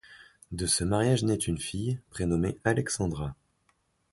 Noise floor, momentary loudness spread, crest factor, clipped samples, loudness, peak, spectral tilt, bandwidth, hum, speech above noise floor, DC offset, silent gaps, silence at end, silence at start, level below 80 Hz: -72 dBFS; 8 LU; 18 dB; under 0.1%; -29 LUFS; -12 dBFS; -5 dB/octave; 12 kHz; none; 43 dB; under 0.1%; none; 0.8 s; 0.1 s; -46 dBFS